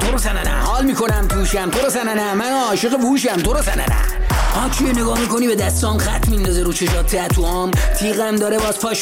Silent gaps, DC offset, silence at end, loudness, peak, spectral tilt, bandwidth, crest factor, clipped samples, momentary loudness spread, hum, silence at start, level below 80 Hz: none; under 0.1%; 0 s; -18 LUFS; -6 dBFS; -4.5 dB/octave; 17 kHz; 10 dB; under 0.1%; 2 LU; none; 0 s; -20 dBFS